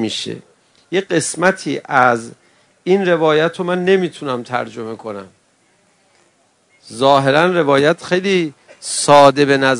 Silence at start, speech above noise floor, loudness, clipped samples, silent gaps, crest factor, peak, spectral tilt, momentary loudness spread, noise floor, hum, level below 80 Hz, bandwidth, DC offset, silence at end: 0 s; 43 dB; -15 LUFS; 0.3%; none; 16 dB; 0 dBFS; -4.5 dB/octave; 17 LU; -57 dBFS; none; -62 dBFS; 12 kHz; under 0.1%; 0 s